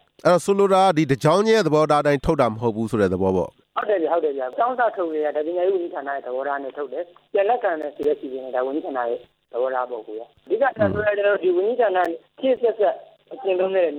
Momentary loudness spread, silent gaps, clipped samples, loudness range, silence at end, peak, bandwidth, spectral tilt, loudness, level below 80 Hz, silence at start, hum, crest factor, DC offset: 11 LU; none; under 0.1%; 6 LU; 0 s; -6 dBFS; 14 kHz; -6 dB/octave; -21 LUFS; -50 dBFS; 0.25 s; none; 16 dB; under 0.1%